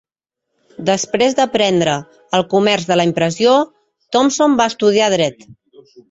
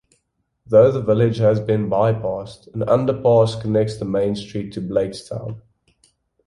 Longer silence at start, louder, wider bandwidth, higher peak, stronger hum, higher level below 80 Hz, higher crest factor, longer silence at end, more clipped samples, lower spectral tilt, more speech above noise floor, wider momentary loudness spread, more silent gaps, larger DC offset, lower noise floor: about the same, 0.8 s vs 0.7 s; first, -15 LUFS vs -19 LUFS; second, 8.2 kHz vs 11.5 kHz; about the same, -2 dBFS vs -2 dBFS; neither; second, -56 dBFS vs -50 dBFS; about the same, 14 dB vs 16 dB; second, 0.55 s vs 0.9 s; neither; second, -4 dB/octave vs -8 dB/octave; first, 64 dB vs 52 dB; second, 6 LU vs 15 LU; neither; neither; first, -78 dBFS vs -71 dBFS